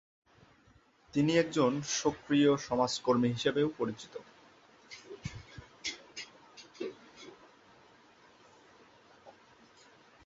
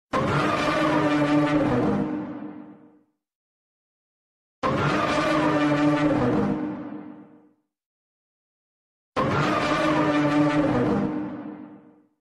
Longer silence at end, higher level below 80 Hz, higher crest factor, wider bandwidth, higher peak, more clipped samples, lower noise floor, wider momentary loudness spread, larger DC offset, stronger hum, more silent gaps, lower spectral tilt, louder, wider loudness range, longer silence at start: first, 0.95 s vs 0.45 s; second, -66 dBFS vs -50 dBFS; first, 22 dB vs 16 dB; second, 8 kHz vs 11.5 kHz; second, -14 dBFS vs -8 dBFS; neither; first, -65 dBFS vs -60 dBFS; first, 24 LU vs 16 LU; neither; neither; second, none vs 3.35-4.62 s, 7.86-9.12 s; second, -5 dB/octave vs -6.5 dB/octave; second, -31 LUFS vs -23 LUFS; first, 20 LU vs 7 LU; first, 1.15 s vs 0.15 s